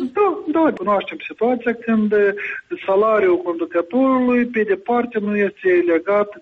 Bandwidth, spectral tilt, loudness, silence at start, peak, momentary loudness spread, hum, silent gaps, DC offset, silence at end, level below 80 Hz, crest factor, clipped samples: 5.8 kHz; -8.5 dB/octave; -18 LUFS; 0 s; -8 dBFS; 6 LU; none; none; under 0.1%; 0 s; -60 dBFS; 10 dB; under 0.1%